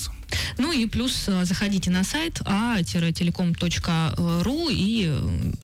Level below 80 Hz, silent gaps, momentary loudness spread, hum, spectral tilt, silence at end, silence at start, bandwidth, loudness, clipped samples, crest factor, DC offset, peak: -38 dBFS; none; 3 LU; none; -5 dB/octave; 0 s; 0 s; 16 kHz; -24 LUFS; under 0.1%; 8 dB; under 0.1%; -16 dBFS